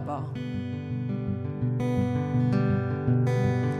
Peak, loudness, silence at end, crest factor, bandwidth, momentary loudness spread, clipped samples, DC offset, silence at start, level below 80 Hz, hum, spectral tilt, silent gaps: -12 dBFS; -28 LUFS; 0 s; 14 dB; 9 kHz; 8 LU; under 0.1%; under 0.1%; 0 s; -52 dBFS; none; -9 dB/octave; none